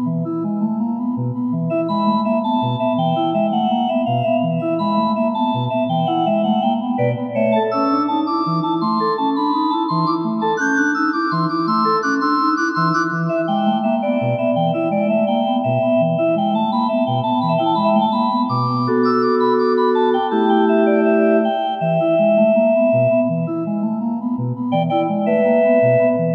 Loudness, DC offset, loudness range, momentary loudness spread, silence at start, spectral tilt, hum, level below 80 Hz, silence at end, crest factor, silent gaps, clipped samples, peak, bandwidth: -18 LUFS; under 0.1%; 3 LU; 5 LU; 0 s; -7.5 dB/octave; none; -70 dBFS; 0 s; 14 dB; none; under 0.1%; -4 dBFS; 6.6 kHz